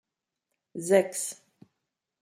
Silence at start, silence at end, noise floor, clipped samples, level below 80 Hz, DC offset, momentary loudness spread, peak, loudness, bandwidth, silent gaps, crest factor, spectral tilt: 0.75 s; 0.85 s; -85 dBFS; under 0.1%; -80 dBFS; under 0.1%; 20 LU; -8 dBFS; -27 LUFS; 15.5 kHz; none; 22 dB; -4 dB/octave